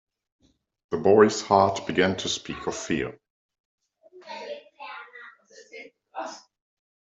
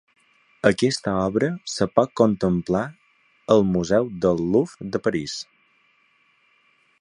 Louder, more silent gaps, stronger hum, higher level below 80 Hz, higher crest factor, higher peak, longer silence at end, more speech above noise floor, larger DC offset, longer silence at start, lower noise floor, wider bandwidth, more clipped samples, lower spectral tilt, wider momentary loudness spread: about the same, -23 LUFS vs -22 LUFS; first, 3.30-3.49 s, 3.60-3.78 s vs none; neither; second, -62 dBFS vs -52 dBFS; about the same, 24 dB vs 22 dB; second, -4 dBFS vs 0 dBFS; second, 0.65 s vs 1.6 s; second, 29 dB vs 41 dB; neither; first, 0.9 s vs 0.65 s; second, -52 dBFS vs -62 dBFS; second, 8 kHz vs 11 kHz; neither; second, -4.5 dB/octave vs -6 dB/octave; first, 25 LU vs 9 LU